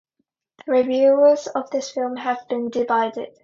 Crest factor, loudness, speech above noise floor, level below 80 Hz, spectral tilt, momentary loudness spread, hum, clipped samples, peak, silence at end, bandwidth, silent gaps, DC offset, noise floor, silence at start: 16 dB; -20 LUFS; 55 dB; -70 dBFS; -4 dB/octave; 11 LU; none; under 0.1%; -6 dBFS; 0.15 s; 7.6 kHz; none; under 0.1%; -74 dBFS; 0.65 s